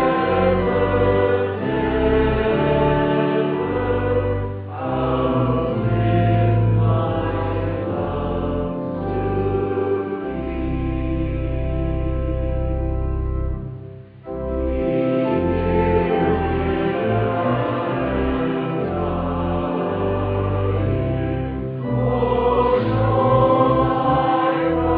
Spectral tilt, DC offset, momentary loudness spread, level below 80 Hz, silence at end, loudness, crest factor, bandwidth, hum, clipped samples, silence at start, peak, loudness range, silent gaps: -11.5 dB/octave; under 0.1%; 7 LU; -30 dBFS; 0 s; -20 LUFS; 16 dB; 4.8 kHz; none; under 0.1%; 0 s; -4 dBFS; 5 LU; none